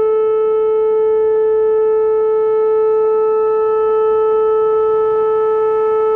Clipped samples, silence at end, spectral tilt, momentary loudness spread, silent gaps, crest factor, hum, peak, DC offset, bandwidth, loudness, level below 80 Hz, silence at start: under 0.1%; 0 s; -7.5 dB/octave; 1 LU; none; 6 dB; none; -8 dBFS; under 0.1%; 3.2 kHz; -14 LUFS; -52 dBFS; 0 s